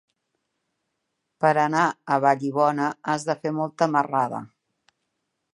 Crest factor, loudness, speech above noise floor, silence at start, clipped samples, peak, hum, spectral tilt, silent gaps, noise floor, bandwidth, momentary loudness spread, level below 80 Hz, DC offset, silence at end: 20 dB; -23 LUFS; 56 dB; 1.4 s; under 0.1%; -4 dBFS; none; -6 dB/octave; none; -78 dBFS; 11.5 kHz; 6 LU; -76 dBFS; under 0.1%; 1.1 s